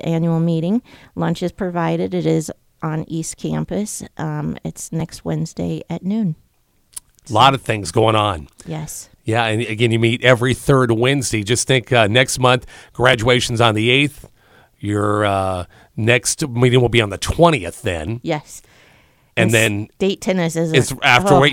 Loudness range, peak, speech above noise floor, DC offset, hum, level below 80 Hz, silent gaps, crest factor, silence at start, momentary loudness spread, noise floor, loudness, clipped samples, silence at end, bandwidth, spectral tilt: 9 LU; 0 dBFS; 41 dB; under 0.1%; none; -42 dBFS; none; 18 dB; 0.05 s; 13 LU; -58 dBFS; -17 LUFS; under 0.1%; 0 s; 17 kHz; -4.5 dB/octave